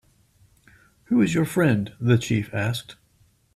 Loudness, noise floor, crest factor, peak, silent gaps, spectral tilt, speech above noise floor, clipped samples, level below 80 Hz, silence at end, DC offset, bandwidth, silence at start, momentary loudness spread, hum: -23 LUFS; -61 dBFS; 18 dB; -8 dBFS; none; -6.5 dB/octave; 40 dB; under 0.1%; -56 dBFS; 0.6 s; under 0.1%; 14.5 kHz; 1.1 s; 6 LU; none